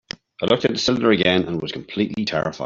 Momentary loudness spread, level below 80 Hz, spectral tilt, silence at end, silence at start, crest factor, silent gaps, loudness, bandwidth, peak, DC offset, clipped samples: 10 LU; -54 dBFS; -5 dB/octave; 0 s; 0.4 s; 18 dB; none; -20 LUFS; 7.6 kHz; -2 dBFS; under 0.1%; under 0.1%